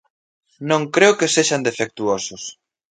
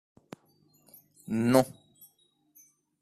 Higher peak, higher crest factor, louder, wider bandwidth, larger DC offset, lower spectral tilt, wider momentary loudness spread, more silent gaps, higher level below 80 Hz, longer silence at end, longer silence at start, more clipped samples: first, 0 dBFS vs -6 dBFS; second, 20 dB vs 26 dB; first, -18 LUFS vs -27 LUFS; second, 9.6 kHz vs 14.5 kHz; neither; second, -3 dB/octave vs -6 dB/octave; second, 17 LU vs 27 LU; neither; about the same, -64 dBFS vs -68 dBFS; second, 0.4 s vs 1.35 s; second, 0.6 s vs 1.3 s; neither